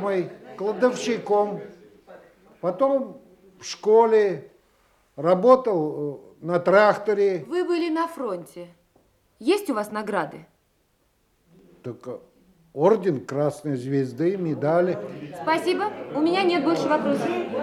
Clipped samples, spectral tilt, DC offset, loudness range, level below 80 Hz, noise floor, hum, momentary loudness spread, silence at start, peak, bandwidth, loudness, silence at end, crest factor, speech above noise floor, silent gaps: under 0.1%; -6 dB/octave; under 0.1%; 9 LU; -70 dBFS; -67 dBFS; none; 18 LU; 0 s; -4 dBFS; 14.5 kHz; -23 LUFS; 0 s; 20 dB; 44 dB; none